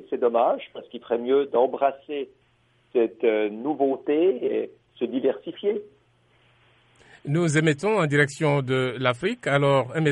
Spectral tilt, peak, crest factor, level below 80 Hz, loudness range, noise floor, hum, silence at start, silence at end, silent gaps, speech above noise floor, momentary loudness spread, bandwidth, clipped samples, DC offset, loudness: -6 dB/octave; -6 dBFS; 18 dB; -66 dBFS; 4 LU; -63 dBFS; none; 0 s; 0 s; none; 40 dB; 12 LU; 11.5 kHz; under 0.1%; under 0.1%; -24 LUFS